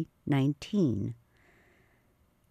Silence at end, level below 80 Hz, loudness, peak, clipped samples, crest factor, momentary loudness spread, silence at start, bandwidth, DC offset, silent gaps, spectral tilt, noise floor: 1.35 s; -64 dBFS; -30 LUFS; -16 dBFS; under 0.1%; 18 dB; 10 LU; 0 s; 13 kHz; under 0.1%; none; -8 dB/octave; -68 dBFS